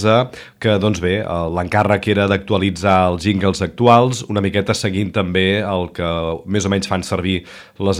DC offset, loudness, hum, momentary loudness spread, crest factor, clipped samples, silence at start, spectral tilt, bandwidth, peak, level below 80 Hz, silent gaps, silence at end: under 0.1%; -17 LUFS; none; 7 LU; 16 dB; under 0.1%; 0 s; -5.5 dB/octave; 15 kHz; 0 dBFS; -42 dBFS; none; 0 s